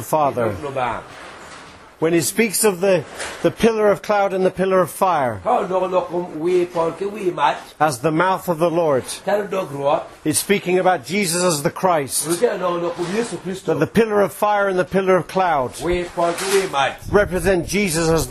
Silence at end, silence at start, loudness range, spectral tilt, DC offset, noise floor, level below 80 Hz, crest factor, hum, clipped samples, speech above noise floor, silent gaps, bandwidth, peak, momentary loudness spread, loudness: 0 s; 0 s; 2 LU; -4.5 dB/octave; under 0.1%; -40 dBFS; -44 dBFS; 18 dB; none; under 0.1%; 22 dB; none; 13.5 kHz; -2 dBFS; 6 LU; -19 LUFS